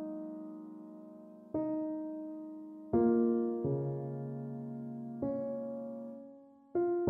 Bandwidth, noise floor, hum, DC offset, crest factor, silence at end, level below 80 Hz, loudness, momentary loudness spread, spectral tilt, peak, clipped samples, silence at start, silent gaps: 2.3 kHz; -56 dBFS; none; under 0.1%; 18 dB; 0 s; -68 dBFS; -37 LUFS; 19 LU; -12.5 dB/octave; -18 dBFS; under 0.1%; 0 s; none